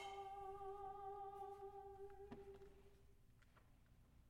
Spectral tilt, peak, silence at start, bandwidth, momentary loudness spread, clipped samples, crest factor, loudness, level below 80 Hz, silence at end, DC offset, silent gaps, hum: -5.5 dB/octave; -44 dBFS; 0 s; 16 kHz; 7 LU; under 0.1%; 14 dB; -56 LUFS; -70 dBFS; 0 s; under 0.1%; none; none